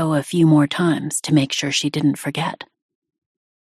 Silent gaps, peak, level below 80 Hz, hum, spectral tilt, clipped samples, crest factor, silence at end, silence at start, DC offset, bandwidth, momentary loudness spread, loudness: none; -4 dBFS; -60 dBFS; none; -5 dB/octave; under 0.1%; 16 dB; 1.1 s; 0 s; under 0.1%; 14 kHz; 10 LU; -19 LUFS